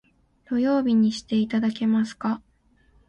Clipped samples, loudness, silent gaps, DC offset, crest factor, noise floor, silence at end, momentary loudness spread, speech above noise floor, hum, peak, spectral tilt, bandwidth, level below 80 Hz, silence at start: under 0.1%; -24 LUFS; none; under 0.1%; 12 dB; -61 dBFS; 0.7 s; 8 LU; 38 dB; none; -12 dBFS; -6.5 dB/octave; 8.8 kHz; -60 dBFS; 0.5 s